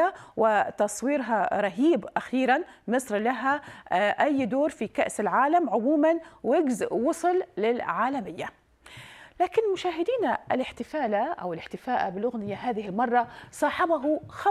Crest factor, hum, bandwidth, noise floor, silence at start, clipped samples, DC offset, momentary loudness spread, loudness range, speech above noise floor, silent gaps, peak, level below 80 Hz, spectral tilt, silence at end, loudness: 18 dB; none; 14 kHz; -48 dBFS; 0 s; under 0.1%; under 0.1%; 8 LU; 4 LU; 22 dB; none; -8 dBFS; -64 dBFS; -5 dB/octave; 0 s; -26 LUFS